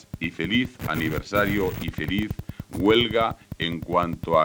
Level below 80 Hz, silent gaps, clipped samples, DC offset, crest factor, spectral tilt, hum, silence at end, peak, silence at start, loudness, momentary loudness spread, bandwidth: -44 dBFS; none; under 0.1%; under 0.1%; 18 dB; -6 dB/octave; none; 0 s; -6 dBFS; 0.15 s; -25 LUFS; 10 LU; over 20 kHz